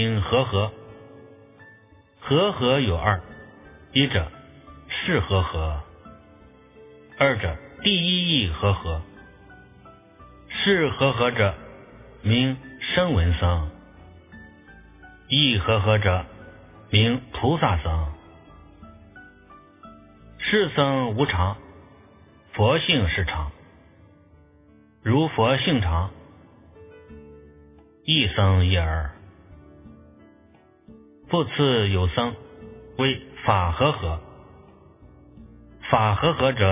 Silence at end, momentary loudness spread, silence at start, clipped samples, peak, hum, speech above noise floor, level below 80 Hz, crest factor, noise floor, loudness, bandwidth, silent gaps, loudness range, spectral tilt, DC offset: 0 s; 15 LU; 0 s; under 0.1%; -2 dBFS; none; 34 dB; -36 dBFS; 22 dB; -55 dBFS; -22 LUFS; 3.9 kHz; none; 4 LU; -10 dB/octave; under 0.1%